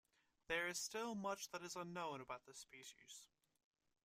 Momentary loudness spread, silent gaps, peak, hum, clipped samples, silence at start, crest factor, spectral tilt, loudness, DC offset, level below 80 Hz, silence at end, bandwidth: 16 LU; none; -28 dBFS; none; under 0.1%; 0.5 s; 22 dB; -2.5 dB/octave; -47 LUFS; under 0.1%; -80 dBFS; 0.8 s; 15.5 kHz